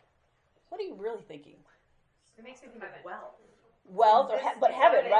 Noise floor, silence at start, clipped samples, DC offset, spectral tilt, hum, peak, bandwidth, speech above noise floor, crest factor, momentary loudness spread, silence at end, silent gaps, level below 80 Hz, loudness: -70 dBFS; 0.7 s; under 0.1%; under 0.1%; -4 dB/octave; none; -8 dBFS; 9.2 kHz; 43 dB; 20 dB; 24 LU; 0 s; none; -78 dBFS; -25 LUFS